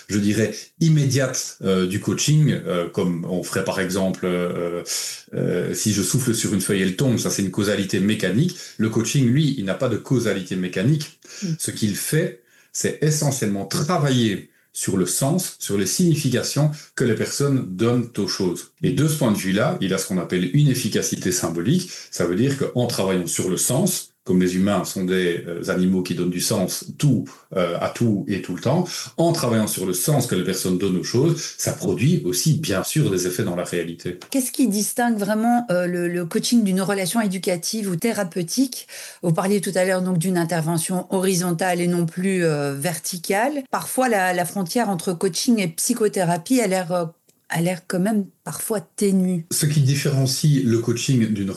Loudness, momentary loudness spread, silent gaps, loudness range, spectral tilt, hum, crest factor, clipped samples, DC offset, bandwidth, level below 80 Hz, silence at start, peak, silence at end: -21 LUFS; 6 LU; none; 2 LU; -5 dB/octave; none; 12 dB; under 0.1%; under 0.1%; 13 kHz; -62 dBFS; 0.1 s; -8 dBFS; 0 s